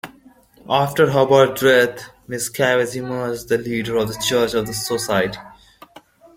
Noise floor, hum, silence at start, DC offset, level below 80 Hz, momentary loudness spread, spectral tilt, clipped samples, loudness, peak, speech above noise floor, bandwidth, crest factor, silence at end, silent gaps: -50 dBFS; none; 0.05 s; under 0.1%; -52 dBFS; 11 LU; -4 dB/octave; under 0.1%; -18 LUFS; -2 dBFS; 31 dB; 16.5 kHz; 18 dB; 0.85 s; none